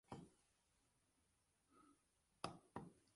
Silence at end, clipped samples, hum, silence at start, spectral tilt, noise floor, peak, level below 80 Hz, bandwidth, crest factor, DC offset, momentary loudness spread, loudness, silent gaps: 0.15 s; under 0.1%; none; 0.1 s; -5 dB/octave; -84 dBFS; -30 dBFS; -82 dBFS; 11.5 kHz; 32 dB; under 0.1%; 7 LU; -57 LUFS; none